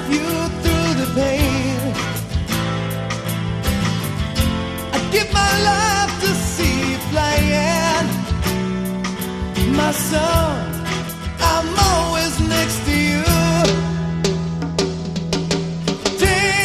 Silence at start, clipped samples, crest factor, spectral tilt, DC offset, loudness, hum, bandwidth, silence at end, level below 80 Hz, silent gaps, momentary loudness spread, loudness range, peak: 0 s; under 0.1%; 18 dB; -4.5 dB/octave; 0.2%; -19 LUFS; none; 14 kHz; 0 s; -30 dBFS; none; 7 LU; 3 LU; -2 dBFS